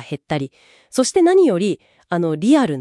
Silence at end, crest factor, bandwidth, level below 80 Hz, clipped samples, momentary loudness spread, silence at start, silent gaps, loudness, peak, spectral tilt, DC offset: 0 s; 14 dB; 12 kHz; -60 dBFS; under 0.1%; 12 LU; 0 s; none; -17 LUFS; -4 dBFS; -5.5 dB/octave; under 0.1%